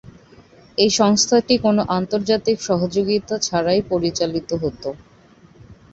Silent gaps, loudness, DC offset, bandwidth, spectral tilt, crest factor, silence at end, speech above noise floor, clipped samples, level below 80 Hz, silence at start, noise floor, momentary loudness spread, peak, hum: none; -19 LUFS; under 0.1%; 8 kHz; -4 dB/octave; 18 dB; 0.2 s; 31 dB; under 0.1%; -50 dBFS; 0.05 s; -49 dBFS; 10 LU; -2 dBFS; none